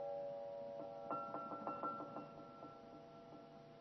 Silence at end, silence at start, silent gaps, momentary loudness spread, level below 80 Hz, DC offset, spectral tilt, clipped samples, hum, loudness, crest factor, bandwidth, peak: 0 s; 0 s; none; 13 LU; -82 dBFS; under 0.1%; -5.5 dB/octave; under 0.1%; none; -49 LUFS; 18 dB; 6 kHz; -30 dBFS